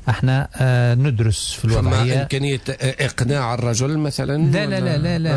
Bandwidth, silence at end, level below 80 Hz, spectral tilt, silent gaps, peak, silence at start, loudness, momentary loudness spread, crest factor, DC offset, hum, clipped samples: 11 kHz; 0 s; -36 dBFS; -5.5 dB/octave; none; -8 dBFS; 0 s; -19 LUFS; 4 LU; 10 dB; under 0.1%; none; under 0.1%